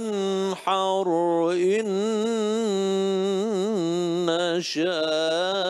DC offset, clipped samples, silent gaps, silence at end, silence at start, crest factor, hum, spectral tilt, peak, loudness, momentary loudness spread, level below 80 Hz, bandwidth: under 0.1%; under 0.1%; none; 0 s; 0 s; 14 dB; none; -5 dB/octave; -8 dBFS; -24 LUFS; 2 LU; -74 dBFS; 12.5 kHz